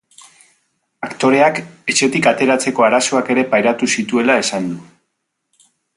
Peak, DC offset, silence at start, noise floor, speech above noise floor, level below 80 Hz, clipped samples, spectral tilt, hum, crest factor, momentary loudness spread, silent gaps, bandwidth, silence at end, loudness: 0 dBFS; under 0.1%; 1 s; -73 dBFS; 57 dB; -62 dBFS; under 0.1%; -3.5 dB/octave; none; 16 dB; 10 LU; none; 11.5 kHz; 1.15 s; -15 LUFS